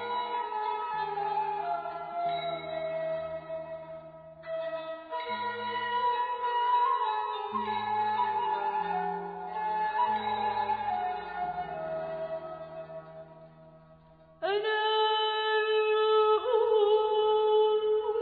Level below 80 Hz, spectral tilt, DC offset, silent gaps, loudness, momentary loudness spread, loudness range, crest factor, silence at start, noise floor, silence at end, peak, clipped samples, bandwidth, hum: -68 dBFS; -6.5 dB/octave; under 0.1%; none; -30 LUFS; 14 LU; 10 LU; 14 dB; 0 s; -57 dBFS; 0 s; -16 dBFS; under 0.1%; 4.8 kHz; none